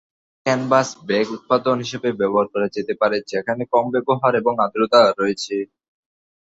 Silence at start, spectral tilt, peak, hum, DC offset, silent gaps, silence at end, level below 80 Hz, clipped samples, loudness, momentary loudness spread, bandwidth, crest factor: 0.45 s; -5 dB/octave; -2 dBFS; none; under 0.1%; none; 0.8 s; -62 dBFS; under 0.1%; -20 LUFS; 9 LU; 8 kHz; 18 dB